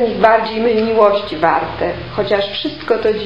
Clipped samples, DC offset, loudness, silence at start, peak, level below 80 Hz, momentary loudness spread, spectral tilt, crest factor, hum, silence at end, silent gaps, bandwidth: under 0.1%; 0.7%; -15 LUFS; 0 s; 0 dBFS; -42 dBFS; 8 LU; -7 dB/octave; 14 dB; none; 0 s; none; 7 kHz